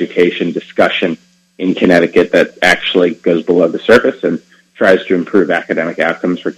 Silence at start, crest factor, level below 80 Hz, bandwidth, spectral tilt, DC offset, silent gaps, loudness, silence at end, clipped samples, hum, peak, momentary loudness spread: 0 s; 12 dB; -50 dBFS; 13.5 kHz; -5.5 dB/octave; under 0.1%; none; -12 LUFS; 0.05 s; 0.5%; none; 0 dBFS; 9 LU